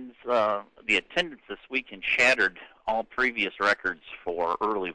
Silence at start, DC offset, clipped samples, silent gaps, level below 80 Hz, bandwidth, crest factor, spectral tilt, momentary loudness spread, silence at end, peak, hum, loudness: 0 s; under 0.1%; under 0.1%; none; -58 dBFS; 10.5 kHz; 16 dB; -2.5 dB/octave; 12 LU; 0 s; -12 dBFS; none; -26 LUFS